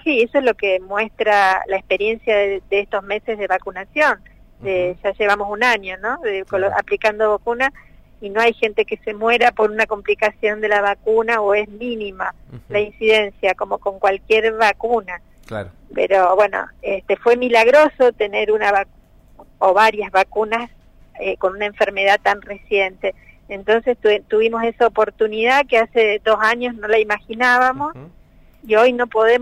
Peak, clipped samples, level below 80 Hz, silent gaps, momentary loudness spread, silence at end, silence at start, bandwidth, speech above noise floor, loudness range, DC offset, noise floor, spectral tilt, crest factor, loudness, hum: -2 dBFS; under 0.1%; -48 dBFS; none; 11 LU; 0 s; 0.05 s; 13 kHz; 29 dB; 4 LU; under 0.1%; -46 dBFS; -4 dB/octave; 16 dB; -17 LUFS; none